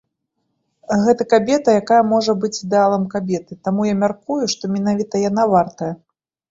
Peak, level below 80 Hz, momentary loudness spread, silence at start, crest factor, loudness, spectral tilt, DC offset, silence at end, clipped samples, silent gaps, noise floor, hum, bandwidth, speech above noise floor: -2 dBFS; -58 dBFS; 9 LU; 0.9 s; 16 dB; -18 LUFS; -5.5 dB/octave; under 0.1%; 0.55 s; under 0.1%; none; -73 dBFS; none; 7.8 kHz; 56 dB